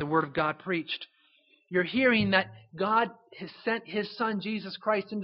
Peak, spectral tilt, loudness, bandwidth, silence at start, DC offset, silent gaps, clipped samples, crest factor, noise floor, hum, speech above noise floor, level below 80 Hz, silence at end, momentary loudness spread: -6 dBFS; -3 dB/octave; -29 LUFS; 5.8 kHz; 0 s; under 0.1%; none; under 0.1%; 24 dB; -65 dBFS; none; 36 dB; -66 dBFS; 0 s; 12 LU